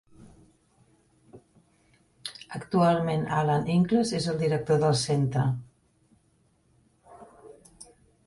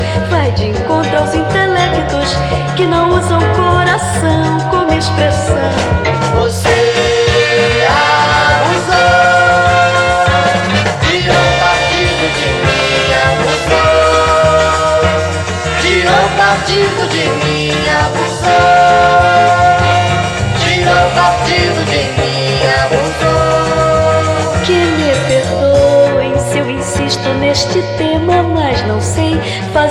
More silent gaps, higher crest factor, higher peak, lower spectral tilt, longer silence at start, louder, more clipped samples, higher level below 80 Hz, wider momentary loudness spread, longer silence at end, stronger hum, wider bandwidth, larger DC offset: neither; first, 18 dB vs 10 dB; second, -10 dBFS vs 0 dBFS; first, -6 dB/octave vs -4.5 dB/octave; first, 0.2 s vs 0 s; second, -26 LUFS vs -11 LUFS; neither; second, -60 dBFS vs -28 dBFS; first, 16 LU vs 5 LU; first, 0.45 s vs 0 s; neither; second, 11.5 kHz vs 13 kHz; neither